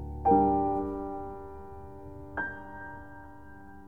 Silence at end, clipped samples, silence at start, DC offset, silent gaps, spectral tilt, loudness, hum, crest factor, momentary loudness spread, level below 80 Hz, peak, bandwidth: 0 s; under 0.1%; 0 s; 0.3%; none; -10 dB/octave; -29 LUFS; none; 20 dB; 24 LU; -48 dBFS; -12 dBFS; 3.4 kHz